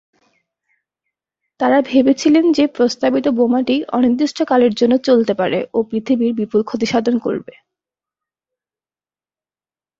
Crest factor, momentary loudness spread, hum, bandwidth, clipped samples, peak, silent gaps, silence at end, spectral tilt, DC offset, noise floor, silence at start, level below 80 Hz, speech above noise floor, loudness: 14 dB; 6 LU; none; 7.6 kHz; under 0.1%; -2 dBFS; none; 2.6 s; -5.5 dB/octave; under 0.1%; under -90 dBFS; 1.6 s; -60 dBFS; over 75 dB; -16 LUFS